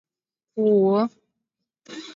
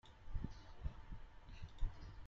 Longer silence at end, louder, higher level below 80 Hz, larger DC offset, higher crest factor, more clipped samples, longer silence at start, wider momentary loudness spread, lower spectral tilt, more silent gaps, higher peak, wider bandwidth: about the same, 0.05 s vs 0 s; first, -21 LUFS vs -53 LUFS; second, -76 dBFS vs -48 dBFS; neither; about the same, 16 dB vs 20 dB; neither; first, 0.55 s vs 0.05 s; first, 21 LU vs 8 LU; about the same, -8 dB/octave vs -7 dB/octave; neither; first, -10 dBFS vs -26 dBFS; first, 7.6 kHz vs 6.8 kHz